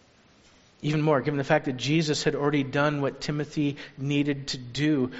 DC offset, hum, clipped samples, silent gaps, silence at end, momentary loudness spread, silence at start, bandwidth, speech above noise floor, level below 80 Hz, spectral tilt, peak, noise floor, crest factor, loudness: under 0.1%; none; under 0.1%; none; 0 s; 7 LU; 0.8 s; 8 kHz; 32 dB; -56 dBFS; -5 dB/octave; -6 dBFS; -58 dBFS; 20 dB; -27 LUFS